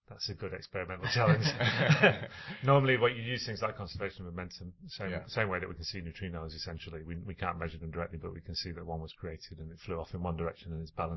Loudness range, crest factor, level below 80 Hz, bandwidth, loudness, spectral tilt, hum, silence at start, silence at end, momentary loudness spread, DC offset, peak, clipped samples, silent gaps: 11 LU; 24 dB; -50 dBFS; 6.2 kHz; -33 LUFS; -6 dB/octave; none; 0.1 s; 0 s; 16 LU; under 0.1%; -10 dBFS; under 0.1%; none